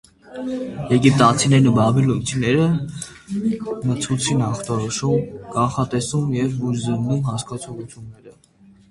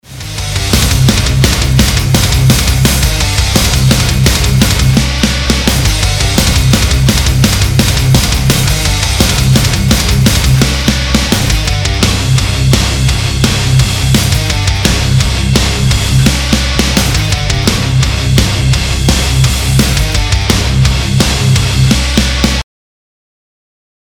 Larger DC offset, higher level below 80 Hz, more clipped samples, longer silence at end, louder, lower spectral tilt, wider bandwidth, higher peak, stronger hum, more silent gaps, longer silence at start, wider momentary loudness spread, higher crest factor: neither; second, -48 dBFS vs -16 dBFS; second, under 0.1% vs 0.2%; second, 0.6 s vs 1.4 s; second, -20 LUFS vs -10 LUFS; first, -5.5 dB/octave vs -4 dB/octave; second, 11.5 kHz vs over 20 kHz; about the same, 0 dBFS vs 0 dBFS; neither; neither; first, 0.3 s vs 0.1 s; first, 16 LU vs 3 LU; first, 20 dB vs 10 dB